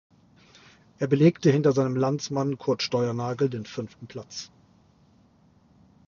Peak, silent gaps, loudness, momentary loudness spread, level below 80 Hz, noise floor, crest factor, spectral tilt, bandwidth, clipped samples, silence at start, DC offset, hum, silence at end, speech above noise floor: -6 dBFS; none; -25 LUFS; 18 LU; -64 dBFS; -60 dBFS; 22 dB; -6.5 dB/octave; 7.4 kHz; under 0.1%; 1 s; under 0.1%; none; 1.6 s; 35 dB